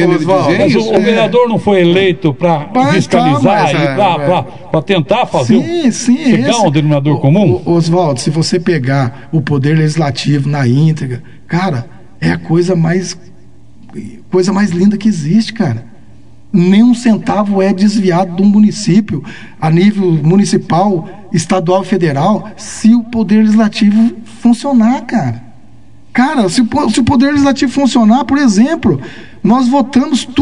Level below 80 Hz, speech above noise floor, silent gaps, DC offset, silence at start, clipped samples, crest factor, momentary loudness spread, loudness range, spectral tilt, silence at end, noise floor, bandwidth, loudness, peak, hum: -46 dBFS; 31 dB; none; 2%; 0 s; 0.1%; 10 dB; 8 LU; 4 LU; -6.5 dB/octave; 0 s; -42 dBFS; 10.5 kHz; -11 LUFS; 0 dBFS; none